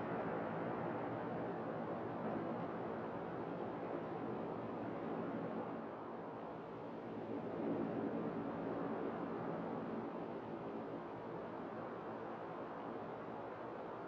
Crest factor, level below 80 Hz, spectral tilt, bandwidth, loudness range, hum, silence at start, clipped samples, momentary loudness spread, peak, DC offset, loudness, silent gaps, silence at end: 14 dB; -76 dBFS; -6.5 dB/octave; 6.8 kHz; 4 LU; none; 0 s; under 0.1%; 6 LU; -30 dBFS; under 0.1%; -45 LUFS; none; 0 s